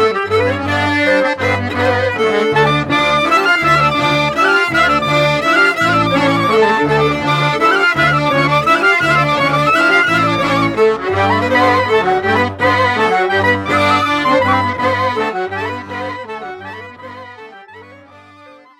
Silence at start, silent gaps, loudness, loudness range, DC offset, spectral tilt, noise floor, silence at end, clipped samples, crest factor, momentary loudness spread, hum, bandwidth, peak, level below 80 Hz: 0 s; none; -13 LUFS; 6 LU; under 0.1%; -5 dB/octave; -41 dBFS; 0.25 s; under 0.1%; 12 dB; 10 LU; none; 16.5 kHz; -2 dBFS; -44 dBFS